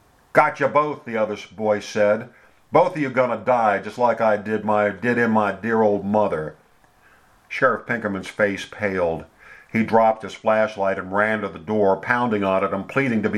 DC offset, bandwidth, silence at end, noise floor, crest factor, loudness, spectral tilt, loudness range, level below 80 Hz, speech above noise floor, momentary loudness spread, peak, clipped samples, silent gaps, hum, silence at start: under 0.1%; 12.5 kHz; 0 s; -56 dBFS; 20 dB; -21 LUFS; -6.5 dB/octave; 4 LU; -60 dBFS; 35 dB; 7 LU; 0 dBFS; under 0.1%; none; none; 0.35 s